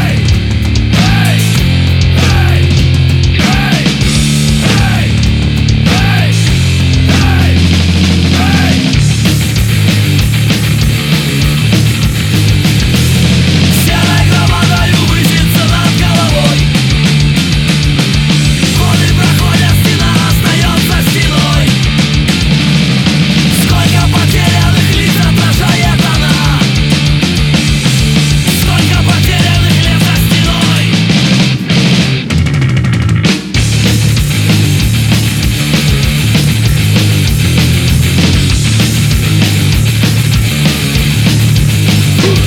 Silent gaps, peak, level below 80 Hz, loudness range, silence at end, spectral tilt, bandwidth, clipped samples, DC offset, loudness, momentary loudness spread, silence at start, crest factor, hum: none; 0 dBFS; -18 dBFS; 1 LU; 0 s; -5 dB/octave; 17.5 kHz; under 0.1%; under 0.1%; -9 LUFS; 2 LU; 0 s; 8 dB; none